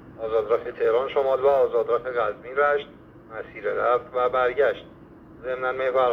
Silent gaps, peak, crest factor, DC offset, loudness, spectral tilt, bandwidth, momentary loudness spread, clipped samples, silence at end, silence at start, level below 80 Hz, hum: none; -8 dBFS; 16 dB; under 0.1%; -24 LUFS; -6.5 dB/octave; 6 kHz; 14 LU; under 0.1%; 0 s; 0 s; -58 dBFS; none